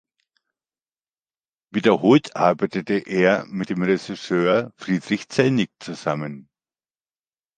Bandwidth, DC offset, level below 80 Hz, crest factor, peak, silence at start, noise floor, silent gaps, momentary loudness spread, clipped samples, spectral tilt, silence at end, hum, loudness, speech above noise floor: 9.4 kHz; under 0.1%; -64 dBFS; 20 dB; -2 dBFS; 1.75 s; under -90 dBFS; none; 11 LU; under 0.1%; -6.5 dB/octave; 1.15 s; none; -21 LUFS; over 69 dB